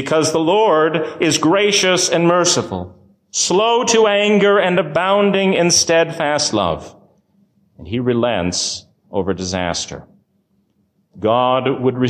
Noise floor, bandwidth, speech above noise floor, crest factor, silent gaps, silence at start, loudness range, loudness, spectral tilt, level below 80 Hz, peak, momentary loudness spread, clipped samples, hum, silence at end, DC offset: -62 dBFS; 15.5 kHz; 47 dB; 14 dB; none; 0 s; 7 LU; -15 LUFS; -3.5 dB/octave; -46 dBFS; -4 dBFS; 11 LU; under 0.1%; none; 0 s; under 0.1%